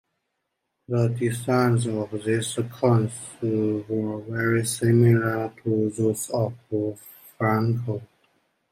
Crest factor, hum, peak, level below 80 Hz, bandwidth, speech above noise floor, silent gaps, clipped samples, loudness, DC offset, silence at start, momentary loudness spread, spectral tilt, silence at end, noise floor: 18 dB; none; -8 dBFS; -64 dBFS; 15.5 kHz; 55 dB; none; under 0.1%; -24 LUFS; under 0.1%; 0.9 s; 8 LU; -6.5 dB/octave; 0.65 s; -79 dBFS